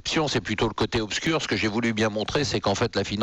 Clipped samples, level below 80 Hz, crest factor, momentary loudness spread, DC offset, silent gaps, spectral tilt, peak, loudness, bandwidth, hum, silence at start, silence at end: under 0.1%; -46 dBFS; 12 dB; 2 LU; under 0.1%; none; -4.5 dB/octave; -12 dBFS; -25 LUFS; 11 kHz; none; 0.05 s; 0 s